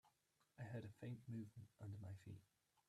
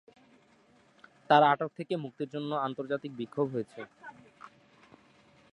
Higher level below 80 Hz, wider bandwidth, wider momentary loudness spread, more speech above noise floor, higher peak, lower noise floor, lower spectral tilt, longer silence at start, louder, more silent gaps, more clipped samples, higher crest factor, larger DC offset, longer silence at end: about the same, -84 dBFS vs -80 dBFS; first, 13.5 kHz vs 10.5 kHz; second, 7 LU vs 24 LU; second, 29 dB vs 34 dB; second, -42 dBFS vs -8 dBFS; first, -84 dBFS vs -64 dBFS; about the same, -8 dB/octave vs -7 dB/octave; second, 0.05 s vs 1.3 s; second, -56 LUFS vs -30 LUFS; neither; neither; second, 14 dB vs 24 dB; neither; second, 0.45 s vs 1.05 s